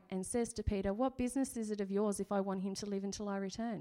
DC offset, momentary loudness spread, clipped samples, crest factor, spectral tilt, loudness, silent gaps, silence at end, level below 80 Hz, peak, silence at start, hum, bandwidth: under 0.1%; 4 LU; under 0.1%; 14 dB; -5.5 dB/octave; -38 LUFS; none; 0 s; -54 dBFS; -22 dBFS; 0.1 s; none; 14 kHz